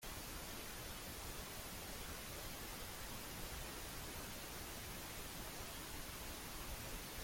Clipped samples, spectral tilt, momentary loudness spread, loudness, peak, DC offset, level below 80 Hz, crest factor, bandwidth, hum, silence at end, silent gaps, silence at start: under 0.1%; -2.5 dB/octave; 1 LU; -48 LUFS; -34 dBFS; under 0.1%; -56 dBFS; 14 dB; 16.5 kHz; none; 0 s; none; 0 s